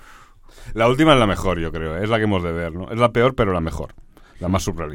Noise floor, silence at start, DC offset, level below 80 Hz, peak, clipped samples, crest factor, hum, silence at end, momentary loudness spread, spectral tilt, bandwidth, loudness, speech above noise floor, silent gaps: -45 dBFS; 0.05 s; under 0.1%; -34 dBFS; 0 dBFS; under 0.1%; 20 dB; none; 0 s; 14 LU; -6 dB/octave; 17 kHz; -19 LUFS; 26 dB; none